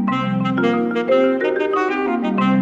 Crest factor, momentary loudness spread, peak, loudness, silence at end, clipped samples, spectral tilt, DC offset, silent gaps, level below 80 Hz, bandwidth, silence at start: 12 dB; 3 LU; -6 dBFS; -18 LUFS; 0 s; under 0.1%; -7.5 dB/octave; under 0.1%; none; -56 dBFS; 7.6 kHz; 0 s